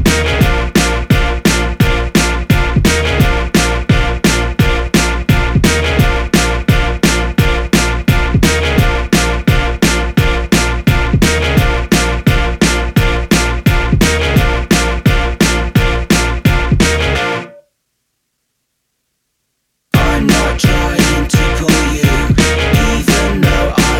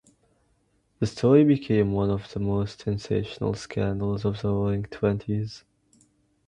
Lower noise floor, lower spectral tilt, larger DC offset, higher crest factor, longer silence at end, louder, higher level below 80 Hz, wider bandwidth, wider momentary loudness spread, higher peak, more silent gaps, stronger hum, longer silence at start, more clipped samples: about the same, -68 dBFS vs -68 dBFS; second, -4.5 dB/octave vs -8 dB/octave; neither; second, 12 dB vs 20 dB; second, 0 s vs 0.9 s; first, -12 LUFS vs -25 LUFS; first, -18 dBFS vs -48 dBFS; first, 18.5 kHz vs 10 kHz; second, 2 LU vs 12 LU; first, 0 dBFS vs -6 dBFS; neither; neither; second, 0 s vs 1 s; neither